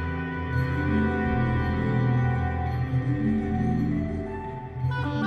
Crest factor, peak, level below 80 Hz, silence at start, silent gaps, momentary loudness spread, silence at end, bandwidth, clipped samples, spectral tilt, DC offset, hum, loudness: 12 dB; -12 dBFS; -38 dBFS; 0 s; none; 7 LU; 0 s; 6.2 kHz; under 0.1%; -9 dB/octave; under 0.1%; none; -26 LUFS